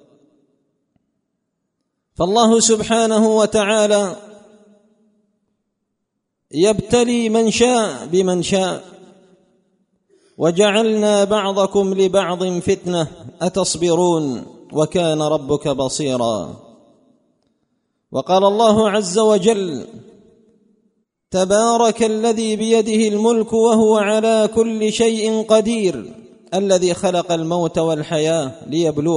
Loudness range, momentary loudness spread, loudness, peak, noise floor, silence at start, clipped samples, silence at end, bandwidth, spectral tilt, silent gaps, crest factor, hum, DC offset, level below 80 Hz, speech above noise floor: 5 LU; 9 LU; -17 LUFS; 0 dBFS; -75 dBFS; 2.2 s; under 0.1%; 0 s; 11 kHz; -4.5 dB/octave; none; 16 dB; none; under 0.1%; -52 dBFS; 59 dB